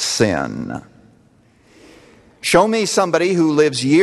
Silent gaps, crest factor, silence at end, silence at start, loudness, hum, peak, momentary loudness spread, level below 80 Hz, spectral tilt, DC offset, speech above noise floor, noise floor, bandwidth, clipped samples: none; 18 dB; 0 s; 0 s; -16 LUFS; none; 0 dBFS; 13 LU; -50 dBFS; -4 dB/octave; under 0.1%; 37 dB; -53 dBFS; 13 kHz; under 0.1%